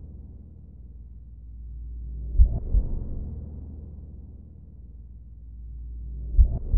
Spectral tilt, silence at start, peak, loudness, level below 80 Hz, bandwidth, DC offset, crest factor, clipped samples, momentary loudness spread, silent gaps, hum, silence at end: -15.5 dB/octave; 0 s; -4 dBFS; -30 LUFS; -28 dBFS; 1 kHz; 0.2%; 22 dB; under 0.1%; 23 LU; none; 50 Hz at -45 dBFS; 0 s